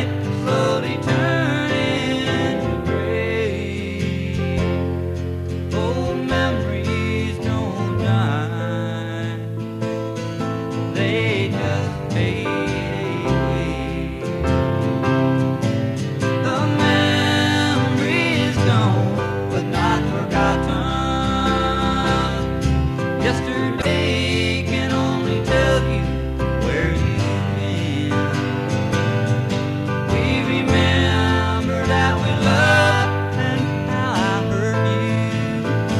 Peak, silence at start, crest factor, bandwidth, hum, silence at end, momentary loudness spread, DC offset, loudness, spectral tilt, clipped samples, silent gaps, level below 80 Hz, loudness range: -4 dBFS; 0 s; 16 dB; 13.5 kHz; none; 0 s; 7 LU; under 0.1%; -20 LUFS; -6 dB/octave; under 0.1%; none; -34 dBFS; 5 LU